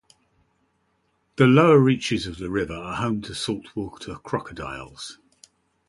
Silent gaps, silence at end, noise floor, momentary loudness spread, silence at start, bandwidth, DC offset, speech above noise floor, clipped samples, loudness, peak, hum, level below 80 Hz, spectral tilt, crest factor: none; 0.75 s; -69 dBFS; 21 LU; 1.4 s; 11.5 kHz; under 0.1%; 47 dB; under 0.1%; -22 LUFS; -4 dBFS; none; -50 dBFS; -6.5 dB/octave; 20 dB